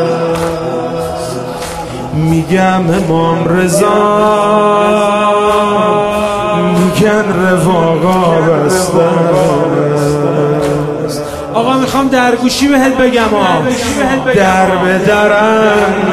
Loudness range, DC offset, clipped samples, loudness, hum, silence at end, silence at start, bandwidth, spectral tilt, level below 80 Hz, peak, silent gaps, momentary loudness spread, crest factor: 2 LU; under 0.1%; under 0.1%; -11 LUFS; none; 0 s; 0 s; 14 kHz; -5.5 dB/octave; -36 dBFS; 0 dBFS; none; 8 LU; 10 dB